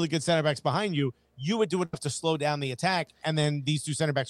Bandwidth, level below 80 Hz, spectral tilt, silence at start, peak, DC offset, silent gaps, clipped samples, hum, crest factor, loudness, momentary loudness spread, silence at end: 12.5 kHz; -66 dBFS; -5 dB/octave; 0 s; -10 dBFS; under 0.1%; none; under 0.1%; none; 18 dB; -28 LUFS; 5 LU; 0 s